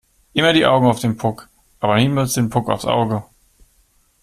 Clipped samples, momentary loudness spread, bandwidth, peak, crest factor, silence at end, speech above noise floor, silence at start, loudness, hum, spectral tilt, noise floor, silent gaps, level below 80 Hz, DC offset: under 0.1%; 10 LU; 15.5 kHz; -2 dBFS; 18 dB; 1 s; 42 dB; 0.35 s; -18 LUFS; none; -5 dB/octave; -58 dBFS; none; -48 dBFS; under 0.1%